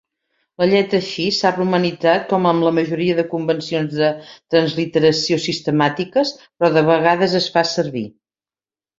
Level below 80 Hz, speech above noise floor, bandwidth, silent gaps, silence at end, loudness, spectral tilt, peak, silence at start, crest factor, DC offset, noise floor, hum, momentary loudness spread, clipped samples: -60 dBFS; over 73 dB; 7.8 kHz; none; 0.9 s; -17 LUFS; -5.5 dB/octave; 0 dBFS; 0.6 s; 18 dB; under 0.1%; under -90 dBFS; none; 6 LU; under 0.1%